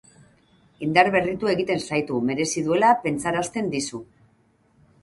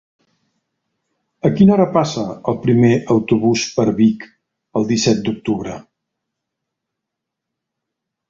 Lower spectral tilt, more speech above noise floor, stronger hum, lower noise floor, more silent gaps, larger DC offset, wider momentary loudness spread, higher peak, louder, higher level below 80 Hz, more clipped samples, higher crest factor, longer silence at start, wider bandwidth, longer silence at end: second, -4.5 dB/octave vs -6 dB/octave; second, 40 dB vs 66 dB; neither; second, -62 dBFS vs -81 dBFS; neither; neither; about the same, 9 LU vs 11 LU; about the same, -2 dBFS vs -2 dBFS; second, -22 LUFS vs -16 LUFS; second, -58 dBFS vs -50 dBFS; neither; first, 22 dB vs 16 dB; second, 0.8 s vs 1.45 s; first, 11.5 kHz vs 7.6 kHz; second, 1 s vs 2.5 s